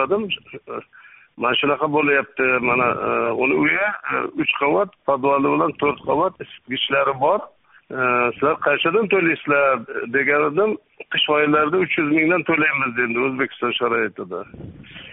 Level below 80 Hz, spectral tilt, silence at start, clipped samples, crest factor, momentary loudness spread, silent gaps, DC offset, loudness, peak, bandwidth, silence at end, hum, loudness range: -60 dBFS; -2.5 dB/octave; 0 s; under 0.1%; 16 dB; 11 LU; none; under 0.1%; -19 LUFS; -4 dBFS; 4 kHz; 0 s; none; 2 LU